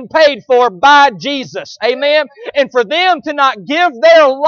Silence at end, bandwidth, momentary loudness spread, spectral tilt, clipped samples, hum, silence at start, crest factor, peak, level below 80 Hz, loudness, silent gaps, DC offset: 0 s; 7 kHz; 11 LU; -3 dB/octave; under 0.1%; none; 0 s; 10 dB; 0 dBFS; -58 dBFS; -11 LUFS; none; under 0.1%